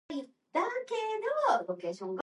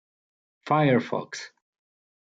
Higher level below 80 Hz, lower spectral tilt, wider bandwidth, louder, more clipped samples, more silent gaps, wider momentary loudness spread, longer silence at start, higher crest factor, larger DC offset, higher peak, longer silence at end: second, -84 dBFS vs -72 dBFS; second, -4.5 dB/octave vs -6.5 dB/octave; first, 11.5 kHz vs 7.8 kHz; second, -33 LUFS vs -24 LUFS; neither; neither; second, 9 LU vs 22 LU; second, 0.1 s vs 0.65 s; about the same, 18 dB vs 20 dB; neither; second, -16 dBFS vs -10 dBFS; second, 0 s vs 0.75 s